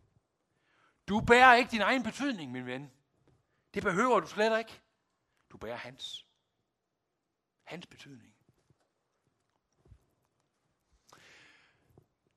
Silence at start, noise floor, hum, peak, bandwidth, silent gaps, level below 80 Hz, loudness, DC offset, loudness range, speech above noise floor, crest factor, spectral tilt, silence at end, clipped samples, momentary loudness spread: 1.1 s; -84 dBFS; none; -6 dBFS; 13.5 kHz; none; -64 dBFS; -27 LUFS; under 0.1%; 20 LU; 56 dB; 26 dB; -4.5 dB/octave; 4.2 s; under 0.1%; 26 LU